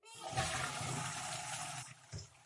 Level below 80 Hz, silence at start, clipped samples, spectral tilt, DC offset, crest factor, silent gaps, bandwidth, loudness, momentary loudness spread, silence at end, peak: -66 dBFS; 0.05 s; under 0.1%; -2.5 dB/octave; under 0.1%; 22 dB; none; 11.5 kHz; -40 LUFS; 12 LU; 0 s; -20 dBFS